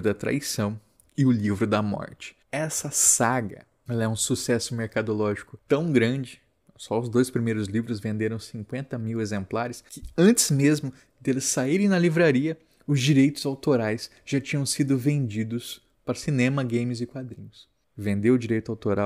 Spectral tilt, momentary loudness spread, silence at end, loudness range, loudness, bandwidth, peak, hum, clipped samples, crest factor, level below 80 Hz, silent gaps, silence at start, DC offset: -5 dB/octave; 15 LU; 0 s; 5 LU; -25 LUFS; 16 kHz; -6 dBFS; none; under 0.1%; 20 dB; -58 dBFS; none; 0 s; under 0.1%